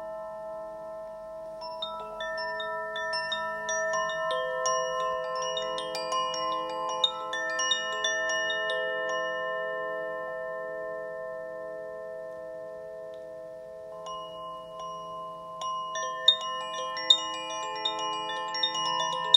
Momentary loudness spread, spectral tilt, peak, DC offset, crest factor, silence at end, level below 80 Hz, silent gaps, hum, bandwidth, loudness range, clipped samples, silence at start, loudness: 14 LU; 0 dB/octave; -4 dBFS; under 0.1%; 28 dB; 0 s; -68 dBFS; none; none; 16 kHz; 12 LU; under 0.1%; 0 s; -30 LUFS